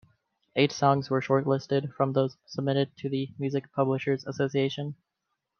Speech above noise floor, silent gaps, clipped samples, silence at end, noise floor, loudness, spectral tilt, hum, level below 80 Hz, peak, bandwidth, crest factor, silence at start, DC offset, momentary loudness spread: 55 dB; none; under 0.1%; 0.65 s; -82 dBFS; -28 LUFS; -6.5 dB/octave; none; -72 dBFS; -8 dBFS; 6.8 kHz; 20 dB; 0.55 s; under 0.1%; 8 LU